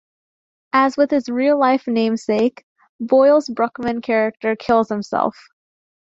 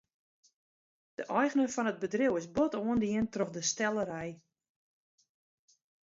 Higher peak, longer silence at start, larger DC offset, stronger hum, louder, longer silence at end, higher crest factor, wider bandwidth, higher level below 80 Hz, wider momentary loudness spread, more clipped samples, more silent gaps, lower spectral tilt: first, -2 dBFS vs -14 dBFS; second, 0.75 s vs 1.2 s; neither; neither; first, -18 LUFS vs -32 LUFS; second, 0.85 s vs 1.8 s; about the same, 16 dB vs 20 dB; about the same, 7.8 kHz vs 7.8 kHz; first, -60 dBFS vs -66 dBFS; second, 7 LU vs 10 LU; neither; first, 2.63-2.76 s, 2.89-2.99 s vs none; first, -6 dB/octave vs -4 dB/octave